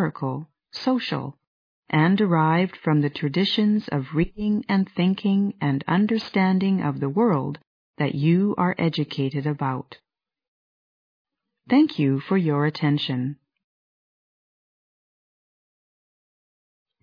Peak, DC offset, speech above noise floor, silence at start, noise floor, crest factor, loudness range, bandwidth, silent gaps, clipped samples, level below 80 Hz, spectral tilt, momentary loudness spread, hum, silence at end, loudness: -6 dBFS; under 0.1%; over 68 dB; 0 s; under -90 dBFS; 18 dB; 5 LU; 5.2 kHz; 1.47-1.83 s, 7.67-7.94 s, 10.48-11.25 s; under 0.1%; -56 dBFS; -8.5 dB/octave; 10 LU; none; 3.7 s; -23 LUFS